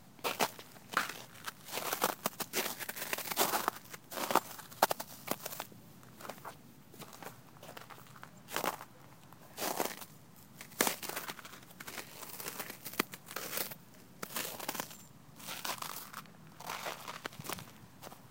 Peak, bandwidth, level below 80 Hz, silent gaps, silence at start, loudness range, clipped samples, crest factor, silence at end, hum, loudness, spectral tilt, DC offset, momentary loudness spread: -8 dBFS; 17 kHz; -76 dBFS; none; 0 s; 10 LU; under 0.1%; 34 dB; 0 s; none; -38 LUFS; -2 dB/octave; under 0.1%; 19 LU